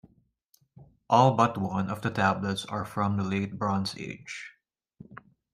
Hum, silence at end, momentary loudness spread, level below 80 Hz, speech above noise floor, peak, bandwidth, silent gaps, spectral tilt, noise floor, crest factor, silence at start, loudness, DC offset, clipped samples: none; 0.35 s; 19 LU; -66 dBFS; 41 dB; -6 dBFS; 14.5 kHz; none; -6 dB/octave; -68 dBFS; 22 dB; 0.8 s; -27 LUFS; under 0.1%; under 0.1%